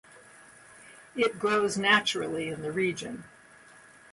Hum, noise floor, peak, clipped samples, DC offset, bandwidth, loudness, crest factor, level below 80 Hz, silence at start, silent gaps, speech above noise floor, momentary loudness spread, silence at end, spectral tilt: none; -54 dBFS; -8 dBFS; under 0.1%; under 0.1%; 11.5 kHz; -27 LUFS; 24 dB; -68 dBFS; 0.15 s; none; 26 dB; 17 LU; 0.35 s; -3.5 dB/octave